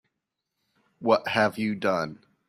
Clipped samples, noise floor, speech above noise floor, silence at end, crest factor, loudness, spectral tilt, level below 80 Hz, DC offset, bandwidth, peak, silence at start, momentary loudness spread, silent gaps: under 0.1%; -83 dBFS; 58 dB; 0.35 s; 20 dB; -26 LUFS; -5.5 dB/octave; -68 dBFS; under 0.1%; 15 kHz; -8 dBFS; 1 s; 9 LU; none